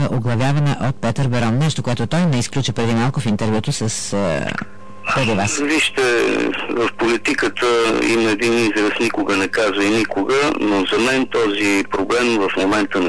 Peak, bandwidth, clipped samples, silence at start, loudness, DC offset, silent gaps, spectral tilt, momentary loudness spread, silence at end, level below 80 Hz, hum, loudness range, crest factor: -10 dBFS; 11 kHz; under 0.1%; 0 s; -18 LUFS; 2%; none; -5 dB/octave; 5 LU; 0 s; -46 dBFS; none; 3 LU; 8 dB